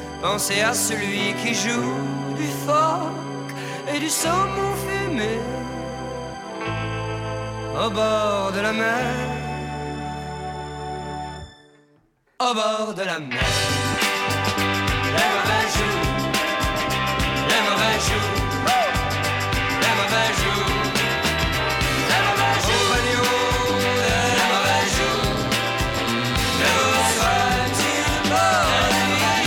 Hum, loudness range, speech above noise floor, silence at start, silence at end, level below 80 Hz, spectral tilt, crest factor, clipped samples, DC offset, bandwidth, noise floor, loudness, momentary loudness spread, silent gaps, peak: none; 7 LU; 39 dB; 0 s; 0 s; -36 dBFS; -3.5 dB/octave; 16 dB; under 0.1%; under 0.1%; 19 kHz; -61 dBFS; -21 LUFS; 12 LU; none; -6 dBFS